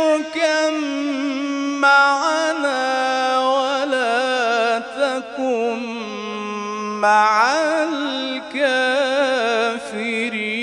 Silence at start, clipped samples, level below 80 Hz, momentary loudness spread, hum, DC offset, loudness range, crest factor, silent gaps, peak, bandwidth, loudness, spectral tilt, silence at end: 0 s; under 0.1%; -68 dBFS; 10 LU; none; under 0.1%; 3 LU; 16 dB; none; -2 dBFS; 11 kHz; -19 LUFS; -2.5 dB/octave; 0 s